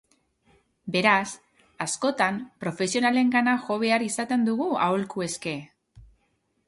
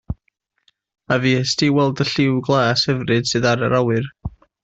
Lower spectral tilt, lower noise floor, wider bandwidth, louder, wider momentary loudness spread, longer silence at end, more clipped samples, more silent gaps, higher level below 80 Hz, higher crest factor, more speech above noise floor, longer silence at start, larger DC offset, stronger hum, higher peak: about the same, -4 dB/octave vs -5 dB/octave; about the same, -71 dBFS vs -69 dBFS; first, 11.5 kHz vs 8 kHz; second, -25 LUFS vs -18 LUFS; second, 12 LU vs 15 LU; first, 0.65 s vs 0.35 s; neither; neither; second, -64 dBFS vs -44 dBFS; about the same, 20 dB vs 16 dB; second, 47 dB vs 51 dB; first, 0.85 s vs 0.1 s; neither; neither; about the same, -6 dBFS vs -4 dBFS